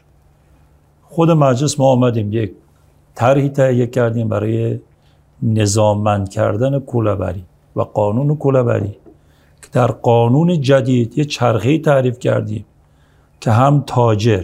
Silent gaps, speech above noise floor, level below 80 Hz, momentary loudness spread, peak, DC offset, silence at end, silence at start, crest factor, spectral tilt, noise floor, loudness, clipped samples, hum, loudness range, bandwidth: none; 37 dB; -50 dBFS; 10 LU; 0 dBFS; under 0.1%; 0 s; 1.1 s; 16 dB; -7 dB/octave; -51 dBFS; -15 LUFS; under 0.1%; none; 3 LU; 13 kHz